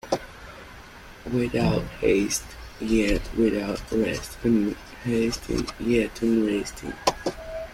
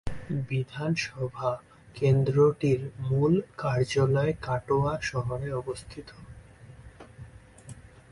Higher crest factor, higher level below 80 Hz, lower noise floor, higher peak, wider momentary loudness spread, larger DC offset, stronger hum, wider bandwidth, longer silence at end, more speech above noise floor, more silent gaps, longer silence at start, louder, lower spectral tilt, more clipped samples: about the same, 20 dB vs 16 dB; first, -40 dBFS vs -50 dBFS; second, -44 dBFS vs -49 dBFS; first, -6 dBFS vs -12 dBFS; second, 18 LU vs 24 LU; neither; neither; first, 16 kHz vs 11.5 kHz; second, 0 s vs 0.3 s; about the same, 20 dB vs 22 dB; neither; about the same, 0.05 s vs 0.05 s; first, -25 LUFS vs -28 LUFS; second, -5 dB/octave vs -7 dB/octave; neither